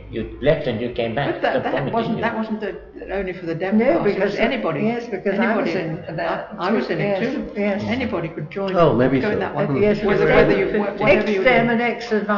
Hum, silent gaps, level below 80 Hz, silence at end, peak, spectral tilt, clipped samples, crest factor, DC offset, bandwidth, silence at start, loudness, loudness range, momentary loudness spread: none; none; -44 dBFS; 0 s; -4 dBFS; -7.5 dB/octave; under 0.1%; 16 dB; under 0.1%; 6 kHz; 0 s; -20 LUFS; 5 LU; 10 LU